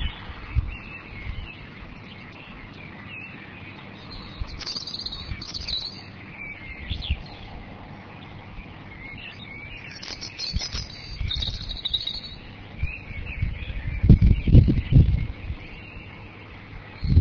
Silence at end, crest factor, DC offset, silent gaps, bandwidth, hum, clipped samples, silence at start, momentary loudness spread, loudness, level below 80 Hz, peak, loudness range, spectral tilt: 0 s; 24 dB; under 0.1%; none; 5.4 kHz; none; under 0.1%; 0 s; 22 LU; -26 LUFS; -30 dBFS; -2 dBFS; 16 LU; -6 dB/octave